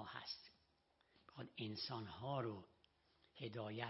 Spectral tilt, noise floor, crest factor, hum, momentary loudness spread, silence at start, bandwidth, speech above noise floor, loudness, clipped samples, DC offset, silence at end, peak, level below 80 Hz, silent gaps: -4 dB/octave; -80 dBFS; 22 dB; none; 18 LU; 0 s; 5.8 kHz; 32 dB; -49 LUFS; under 0.1%; under 0.1%; 0 s; -28 dBFS; -82 dBFS; none